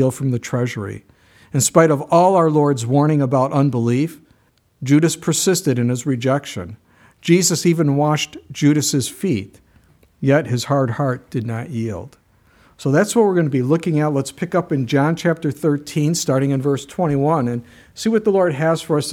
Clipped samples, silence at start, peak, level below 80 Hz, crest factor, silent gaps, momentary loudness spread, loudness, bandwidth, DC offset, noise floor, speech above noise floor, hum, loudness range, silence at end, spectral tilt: under 0.1%; 0 s; 0 dBFS; -58 dBFS; 18 dB; none; 11 LU; -18 LUFS; 16.5 kHz; under 0.1%; -58 dBFS; 40 dB; none; 4 LU; 0 s; -5.5 dB/octave